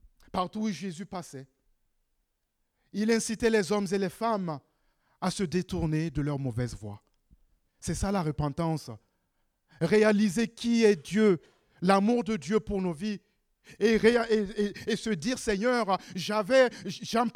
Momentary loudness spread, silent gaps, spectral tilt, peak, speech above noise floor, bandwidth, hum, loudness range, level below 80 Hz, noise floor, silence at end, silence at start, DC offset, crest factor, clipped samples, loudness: 13 LU; none; -5.5 dB/octave; -10 dBFS; 51 dB; 15.5 kHz; none; 7 LU; -52 dBFS; -78 dBFS; 0.05 s; 0.35 s; under 0.1%; 20 dB; under 0.1%; -28 LUFS